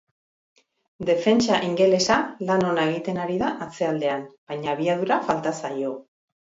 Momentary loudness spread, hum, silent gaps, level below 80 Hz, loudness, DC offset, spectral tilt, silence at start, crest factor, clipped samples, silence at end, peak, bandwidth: 11 LU; none; 4.38-4.47 s; -60 dBFS; -23 LUFS; under 0.1%; -5 dB/octave; 1 s; 18 dB; under 0.1%; 0.55 s; -6 dBFS; 8 kHz